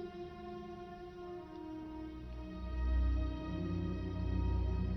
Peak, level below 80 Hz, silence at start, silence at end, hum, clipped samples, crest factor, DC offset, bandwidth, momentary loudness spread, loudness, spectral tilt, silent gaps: -26 dBFS; -40 dBFS; 0 s; 0 s; none; under 0.1%; 12 dB; under 0.1%; 6 kHz; 12 LU; -41 LUFS; -9 dB/octave; none